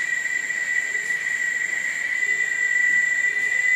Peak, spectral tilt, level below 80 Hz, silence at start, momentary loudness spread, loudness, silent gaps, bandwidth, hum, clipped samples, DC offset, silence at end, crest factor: -10 dBFS; 1 dB/octave; -78 dBFS; 0 s; 5 LU; -21 LUFS; none; 15.5 kHz; none; under 0.1%; under 0.1%; 0 s; 12 dB